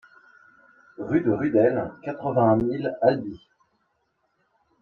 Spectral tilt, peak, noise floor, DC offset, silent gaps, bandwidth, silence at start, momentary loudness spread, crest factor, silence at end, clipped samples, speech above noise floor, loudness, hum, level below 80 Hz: -10 dB/octave; -6 dBFS; -72 dBFS; under 0.1%; none; 4.5 kHz; 1 s; 11 LU; 20 dB; 1.45 s; under 0.1%; 49 dB; -23 LUFS; none; -56 dBFS